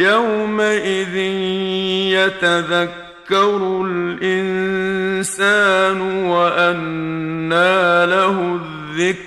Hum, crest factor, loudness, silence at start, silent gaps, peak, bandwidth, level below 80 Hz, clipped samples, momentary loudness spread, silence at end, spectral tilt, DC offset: none; 14 dB; -17 LUFS; 0 s; none; -2 dBFS; 13 kHz; -56 dBFS; under 0.1%; 9 LU; 0 s; -4.5 dB/octave; under 0.1%